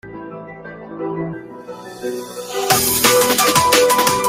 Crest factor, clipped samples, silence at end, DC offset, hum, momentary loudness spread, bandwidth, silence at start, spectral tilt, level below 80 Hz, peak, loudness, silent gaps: 18 dB; under 0.1%; 0 s; under 0.1%; none; 21 LU; 16.5 kHz; 0.05 s; -2 dB/octave; -50 dBFS; 0 dBFS; -14 LUFS; none